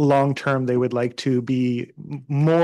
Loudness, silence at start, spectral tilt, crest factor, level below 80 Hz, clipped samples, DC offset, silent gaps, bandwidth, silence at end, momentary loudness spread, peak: -22 LUFS; 0 s; -7.5 dB/octave; 12 dB; -68 dBFS; under 0.1%; under 0.1%; none; 10.5 kHz; 0 s; 9 LU; -8 dBFS